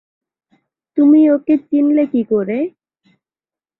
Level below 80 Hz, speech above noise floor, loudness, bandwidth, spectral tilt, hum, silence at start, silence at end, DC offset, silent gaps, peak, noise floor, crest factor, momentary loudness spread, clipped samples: -62 dBFS; over 77 dB; -14 LUFS; 3.9 kHz; -11 dB/octave; none; 0.95 s; 1.1 s; under 0.1%; none; -2 dBFS; under -90 dBFS; 14 dB; 12 LU; under 0.1%